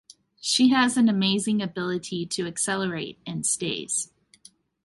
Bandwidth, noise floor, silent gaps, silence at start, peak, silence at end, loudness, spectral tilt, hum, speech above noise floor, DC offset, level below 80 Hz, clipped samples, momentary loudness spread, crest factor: 11.5 kHz; -55 dBFS; none; 0.45 s; -8 dBFS; 0.8 s; -24 LUFS; -3.5 dB/octave; none; 31 dB; under 0.1%; -64 dBFS; under 0.1%; 11 LU; 18 dB